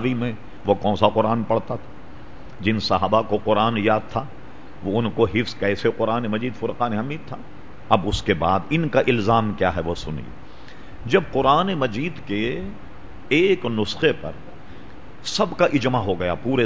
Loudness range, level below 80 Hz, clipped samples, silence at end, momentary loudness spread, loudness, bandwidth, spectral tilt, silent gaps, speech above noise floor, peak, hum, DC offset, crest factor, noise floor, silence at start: 2 LU; -42 dBFS; under 0.1%; 0 s; 19 LU; -22 LUFS; 8 kHz; -6 dB/octave; none; 21 dB; 0 dBFS; none; 2%; 22 dB; -42 dBFS; 0 s